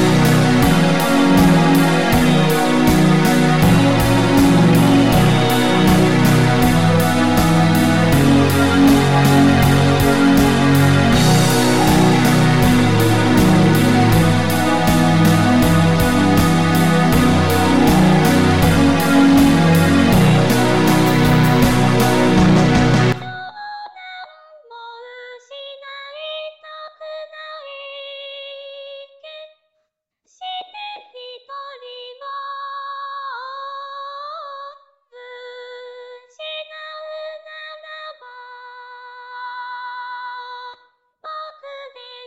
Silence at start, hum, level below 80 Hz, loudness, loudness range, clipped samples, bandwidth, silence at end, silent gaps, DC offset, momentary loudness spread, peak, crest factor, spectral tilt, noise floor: 0 s; none; -34 dBFS; -13 LUFS; 20 LU; under 0.1%; 16.5 kHz; 0 s; none; under 0.1%; 21 LU; -6 dBFS; 10 dB; -6 dB/octave; -72 dBFS